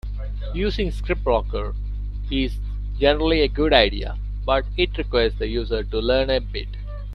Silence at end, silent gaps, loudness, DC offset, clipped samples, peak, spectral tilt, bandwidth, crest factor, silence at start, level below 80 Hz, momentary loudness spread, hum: 0 s; none; -23 LUFS; under 0.1%; under 0.1%; 0 dBFS; -7 dB/octave; 5.8 kHz; 22 dB; 0.05 s; -28 dBFS; 13 LU; 50 Hz at -25 dBFS